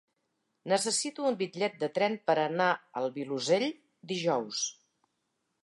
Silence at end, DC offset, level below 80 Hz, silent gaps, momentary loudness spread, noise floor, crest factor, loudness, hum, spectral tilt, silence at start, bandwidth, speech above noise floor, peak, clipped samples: 0.9 s; under 0.1%; -86 dBFS; none; 8 LU; -80 dBFS; 20 dB; -30 LUFS; none; -3 dB/octave; 0.65 s; 11.5 kHz; 50 dB; -12 dBFS; under 0.1%